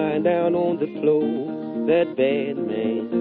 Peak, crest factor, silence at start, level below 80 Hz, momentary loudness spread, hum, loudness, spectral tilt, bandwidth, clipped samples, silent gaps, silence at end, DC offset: -8 dBFS; 14 dB; 0 s; -66 dBFS; 6 LU; none; -22 LUFS; -5.5 dB/octave; 4.4 kHz; under 0.1%; none; 0 s; under 0.1%